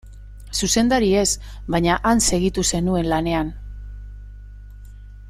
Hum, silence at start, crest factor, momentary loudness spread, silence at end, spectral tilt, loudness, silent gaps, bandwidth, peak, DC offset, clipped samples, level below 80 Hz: 50 Hz at -35 dBFS; 0.05 s; 18 dB; 21 LU; 0 s; -4 dB/octave; -20 LUFS; none; 16 kHz; -4 dBFS; under 0.1%; under 0.1%; -34 dBFS